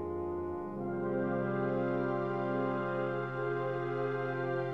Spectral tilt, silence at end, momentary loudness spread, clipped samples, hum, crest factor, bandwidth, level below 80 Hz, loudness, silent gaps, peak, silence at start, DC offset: -9.5 dB/octave; 0 s; 4 LU; under 0.1%; none; 12 dB; 6 kHz; -64 dBFS; -35 LUFS; none; -22 dBFS; 0 s; 0.1%